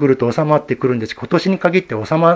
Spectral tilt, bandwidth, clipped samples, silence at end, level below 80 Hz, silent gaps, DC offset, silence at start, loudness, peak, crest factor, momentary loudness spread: -7.5 dB/octave; 8 kHz; under 0.1%; 0 s; -52 dBFS; none; under 0.1%; 0 s; -17 LUFS; 0 dBFS; 16 dB; 4 LU